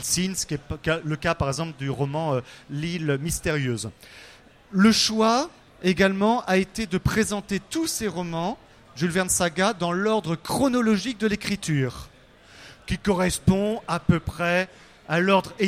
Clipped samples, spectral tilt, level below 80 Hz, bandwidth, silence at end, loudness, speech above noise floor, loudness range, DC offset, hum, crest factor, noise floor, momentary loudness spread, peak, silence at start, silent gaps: under 0.1%; -4.5 dB/octave; -46 dBFS; 16 kHz; 0 s; -24 LUFS; 27 dB; 5 LU; under 0.1%; none; 18 dB; -51 dBFS; 10 LU; -6 dBFS; 0 s; none